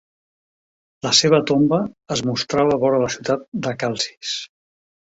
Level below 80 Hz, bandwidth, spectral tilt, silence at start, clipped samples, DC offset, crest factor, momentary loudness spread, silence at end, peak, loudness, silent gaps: -56 dBFS; 8 kHz; -4 dB/octave; 1.05 s; under 0.1%; under 0.1%; 20 dB; 11 LU; 0.6 s; -2 dBFS; -19 LUFS; 3.48-3.52 s